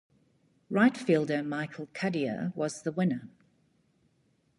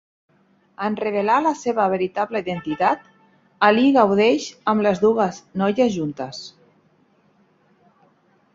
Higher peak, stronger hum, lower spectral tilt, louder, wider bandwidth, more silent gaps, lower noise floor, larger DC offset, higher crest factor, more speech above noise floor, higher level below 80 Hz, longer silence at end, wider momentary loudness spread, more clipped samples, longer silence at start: second, -12 dBFS vs -2 dBFS; neither; about the same, -6.5 dB/octave vs -5.5 dB/octave; second, -30 LUFS vs -20 LUFS; first, 11.5 kHz vs 7.8 kHz; neither; first, -71 dBFS vs -60 dBFS; neither; about the same, 20 dB vs 20 dB; about the same, 41 dB vs 40 dB; second, -76 dBFS vs -62 dBFS; second, 1.3 s vs 2.05 s; about the same, 10 LU vs 12 LU; neither; about the same, 0.7 s vs 0.8 s